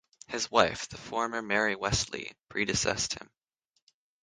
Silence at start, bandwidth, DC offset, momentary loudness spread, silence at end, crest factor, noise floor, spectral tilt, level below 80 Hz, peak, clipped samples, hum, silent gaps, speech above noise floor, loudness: 0.3 s; 10.5 kHz; under 0.1%; 12 LU; 1 s; 26 dB; -79 dBFS; -2.5 dB/octave; -52 dBFS; -6 dBFS; under 0.1%; none; none; 48 dB; -30 LUFS